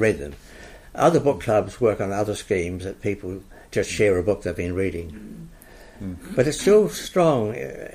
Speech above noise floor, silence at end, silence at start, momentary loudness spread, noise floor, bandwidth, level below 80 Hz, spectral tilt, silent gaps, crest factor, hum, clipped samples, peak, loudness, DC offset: 21 dB; 0 s; 0 s; 19 LU; -43 dBFS; 15.5 kHz; -46 dBFS; -5.5 dB/octave; none; 18 dB; none; under 0.1%; -6 dBFS; -22 LUFS; under 0.1%